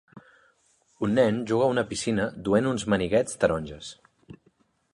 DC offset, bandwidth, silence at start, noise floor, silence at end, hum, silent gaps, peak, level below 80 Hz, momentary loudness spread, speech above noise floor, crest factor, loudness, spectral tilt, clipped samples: under 0.1%; 11.5 kHz; 0.15 s; -66 dBFS; 0.6 s; none; none; -8 dBFS; -52 dBFS; 9 LU; 41 dB; 20 dB; -25 LUFS; -5.5 dB/octave; under 0.1%